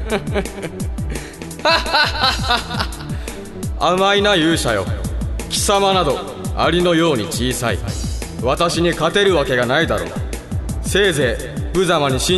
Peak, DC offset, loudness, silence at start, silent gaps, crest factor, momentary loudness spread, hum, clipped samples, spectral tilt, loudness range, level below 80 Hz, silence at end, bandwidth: 0 dBFS; under 0.1%; -18 LUFS; 0 s; none; 16 dB; 12 LU; none; under 0.1%; -4 dB/octave; 2 LU; -30 dBFS; 0 s; 12.5 kHz